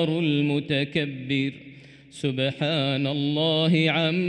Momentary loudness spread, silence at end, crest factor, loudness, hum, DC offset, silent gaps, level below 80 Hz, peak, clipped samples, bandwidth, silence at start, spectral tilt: 9 LU; 0 s; 14 dB; -24 LUFS; none; under 0.1%; none; -64 dBFS; -10 dBFS; under 0.1%; 10.5 kHz; 0 s; -6.5 dB/octave